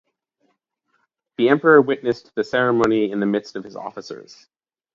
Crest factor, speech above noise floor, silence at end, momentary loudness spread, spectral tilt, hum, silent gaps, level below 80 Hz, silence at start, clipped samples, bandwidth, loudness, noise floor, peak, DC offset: 20 dB; 51 dB; 0.7 s; 21 LU; -6.5 dB/octave; none; none; -62 dBFS; 1.4 s; under 0.1%; 7.6 kHz; -18 LUFS; -70 dBFS; 0 dBFS; under 0.1%